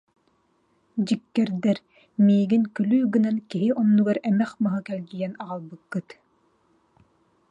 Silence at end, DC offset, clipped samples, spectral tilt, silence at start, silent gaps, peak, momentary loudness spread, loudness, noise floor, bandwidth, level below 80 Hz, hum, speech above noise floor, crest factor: 1.5 s; under 0.1%; under 0.1%; -8 dB/octave; 0.95 s; none; -10 dBFS; 14 LU; -24 LUFS; -67 dBFS; 8.6 kHz; -72 dBFS; none; 44 dB; 14 dB